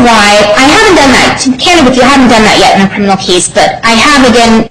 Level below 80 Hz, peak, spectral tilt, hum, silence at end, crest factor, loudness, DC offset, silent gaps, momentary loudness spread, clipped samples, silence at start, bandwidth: -26 dBFS; 0 dBFS; -3 dB/octave; none; 0 s; 4 dB; -4 LUFS; 2%; none; 4 LU; 2%; 0 s; 16.5 kHz